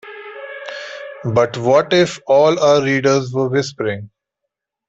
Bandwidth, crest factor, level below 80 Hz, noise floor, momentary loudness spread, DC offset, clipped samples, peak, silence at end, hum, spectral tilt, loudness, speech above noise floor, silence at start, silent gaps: 8 kHz; 14 dB; -56 dBFS; -79 dBFS; 17 LU; under 0.1%; under 0.1%; -2 dBFS; 0.8 s; none; -5.5 dB/octave; -16 LUFS; 64 dB; 0.05 s; none